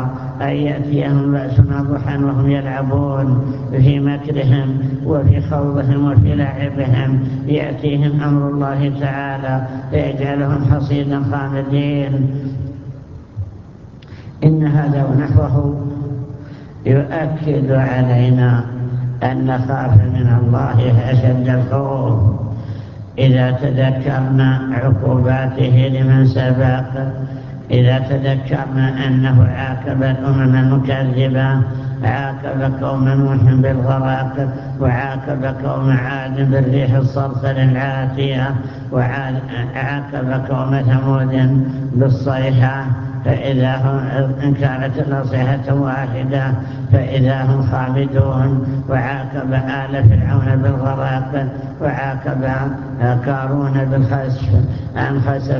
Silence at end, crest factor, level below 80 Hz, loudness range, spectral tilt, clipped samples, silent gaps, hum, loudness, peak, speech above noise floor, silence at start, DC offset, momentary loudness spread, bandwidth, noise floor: 0 s; 16 dB; -34 dBFS; 3 LU; -10 dB/octave; under 0.1%; none; none; -16 LUFS; 0 dBFS; 22 dB; 0 s; under 0.1%; 8 LU; 5.8 kHz; -36 dBFS